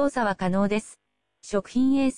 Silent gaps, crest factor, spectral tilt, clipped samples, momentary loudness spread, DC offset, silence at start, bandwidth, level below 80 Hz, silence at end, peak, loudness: none; 14 dB; -6 dB/octave; under 0.1%; 7 LU; under 0.1%; 0 s; 10.5 kHz; -52 dBFS; 0 s; -12 dBFS; -25 LUFS